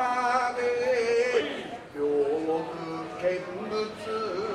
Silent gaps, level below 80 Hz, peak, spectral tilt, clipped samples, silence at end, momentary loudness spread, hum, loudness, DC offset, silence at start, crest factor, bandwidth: none; -64 dBFS; -12 dBFS; -4.5 dB/octave; under 0.1%; 0 s; 10 LU; none; -28 LUFS; under 0.1%; 0 s; 16 dB; 11 kHz